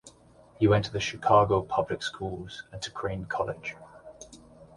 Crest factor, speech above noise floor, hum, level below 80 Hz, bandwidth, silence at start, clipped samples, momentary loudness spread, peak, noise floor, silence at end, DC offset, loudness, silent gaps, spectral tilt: 20 dB; 29 dB; none; -52 dBFS; 11.5 kHz; 0.05 s; under 0.1%; 25 LU; -8 dBFS; -56 dBFS; 0.1 s; under 0.1%; -28 LUFS; none; -5.5 dB/octave